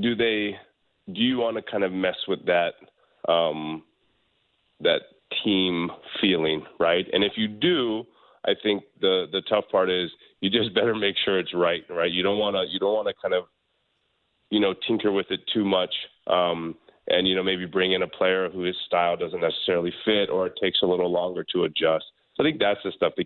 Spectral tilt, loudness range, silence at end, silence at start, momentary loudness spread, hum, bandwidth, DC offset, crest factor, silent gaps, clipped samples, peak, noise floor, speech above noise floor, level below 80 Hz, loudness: -8.5 dB/octave; 3 LU; 0 s; 0 s; 7 LU; none; 4.4 kHz; under 0.1%; 18 dB; none; under 0.1%; -8 dBFS; -72 dBFS; 48 dB; -62 dBFS; -24 LUFS